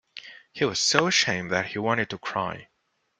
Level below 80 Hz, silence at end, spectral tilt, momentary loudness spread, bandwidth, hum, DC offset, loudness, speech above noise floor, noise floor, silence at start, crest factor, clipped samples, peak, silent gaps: -64 dBFS; 0.55 s; -2.5 dB/octave; 22 LU; 11 kHz; none; under 0.1%; -24 LUFS; 21 dB; -46 dBFS; 0.15 s; 26 dB; under 0.1%; -2 dBFS; none